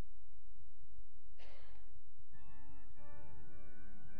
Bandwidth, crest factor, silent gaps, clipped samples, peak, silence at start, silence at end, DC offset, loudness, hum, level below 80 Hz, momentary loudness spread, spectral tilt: 5 kHz; 14 dB; none; under 0.1%; -30 dBFS; 0 s; 0 s; 3%; -64 LUFS; none; -62 dBFS; 8 LU; -6.5 dB/octave